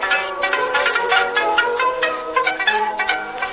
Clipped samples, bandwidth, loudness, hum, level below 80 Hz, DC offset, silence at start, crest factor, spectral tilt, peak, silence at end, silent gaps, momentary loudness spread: under 0.1%; 4 kHz; -18 LUFS; none; -54 dBFS; under 0.1%; 0 s; 16 dB; -5 dB/octave; -2 dBFS; 0 s; none; 4 LU